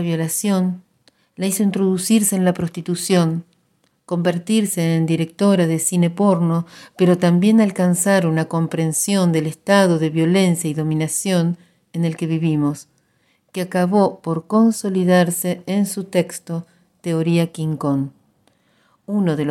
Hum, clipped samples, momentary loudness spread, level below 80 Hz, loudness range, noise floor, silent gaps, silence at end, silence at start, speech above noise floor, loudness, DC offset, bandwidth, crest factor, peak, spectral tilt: none; under 0.1%; 10 LU; -62 dBFS; 5 LU; -63 dBFS; none; 0 s; 0 s; 46 dB; -18 LUFS; under 0.1%; 16 kHz; 18 dB; 0 dBFS; -5.5 dB/octave